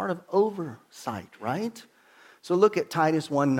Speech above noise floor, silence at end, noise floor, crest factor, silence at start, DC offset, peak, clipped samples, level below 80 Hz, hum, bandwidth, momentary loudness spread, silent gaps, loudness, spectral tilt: 30 dB; 0 s; -56 dBFS; 20 dB; 0 s; under 0.1%; -8 dBFS; under 0.1%; -74 dBFS; none; 16.5 kHz; 14 LU; none; -27 LUFS; -6.5 dB/octave